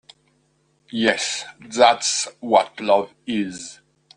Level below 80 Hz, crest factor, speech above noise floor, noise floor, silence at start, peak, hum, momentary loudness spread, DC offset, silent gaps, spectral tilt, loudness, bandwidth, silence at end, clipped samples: -64 dBFS; 22 dB; 44 dB; -64 dBFS; 0.95 s; 0 dBFS; none; 14 LU; under 0.1%; none; -2 dB/octave; -20 LUFS; 10 kHz; 0.45 s; under 0.1%